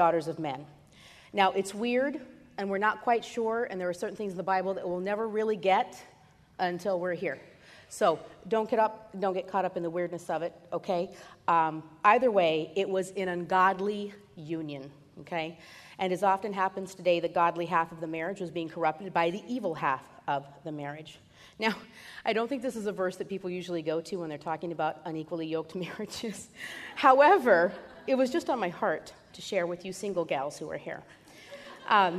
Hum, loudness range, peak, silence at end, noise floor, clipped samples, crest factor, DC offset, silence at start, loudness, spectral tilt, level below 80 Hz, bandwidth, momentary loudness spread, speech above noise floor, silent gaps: none; 8 LU; -8 dBFS; 0 s; -55 dBFS; under 0.1%; 22 dB; under 0.1%; 0 s; -30 LUFS; -5 dB/octave; -70 dBFS; 13.5 kHz; 15 LU; 25 dB; none